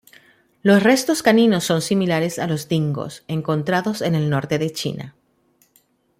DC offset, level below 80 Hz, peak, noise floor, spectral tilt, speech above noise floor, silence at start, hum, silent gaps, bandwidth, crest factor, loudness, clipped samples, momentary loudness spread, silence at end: under 0.1%; -60 dBFS; -2 dBFS; -61 dBFS; -5.5 dB/octave; 42 dB; 0.65 s; none; none; 16 kHz; 18 dB; -19 LUFS; under 0.1%; 12 LU; 1.1 s